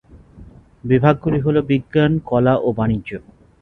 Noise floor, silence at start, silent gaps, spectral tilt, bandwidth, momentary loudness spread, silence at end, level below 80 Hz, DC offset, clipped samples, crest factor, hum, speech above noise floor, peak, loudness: -43 dBFS; 0.15 s; none; -10 dB/octave; 4.1 kHz; 12 LU; 0.4 s; -42 dBFS; under 0.1%; under 0.1%; 18 dB; none; 26 dB; 0 dBFS; -17 LUFS